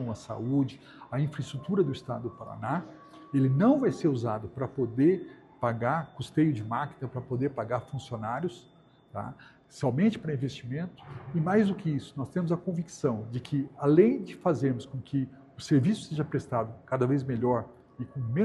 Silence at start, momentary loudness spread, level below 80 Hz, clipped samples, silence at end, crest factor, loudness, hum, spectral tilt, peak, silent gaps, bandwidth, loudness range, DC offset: 0 s; 13 LU; -64 dBFS; under 0.1%; 0 s; 20 dB; -30 LUFS; none; -8 dB/octave; -8 dBFS; none; 11.5 kHz; 5 LU; under 0.1%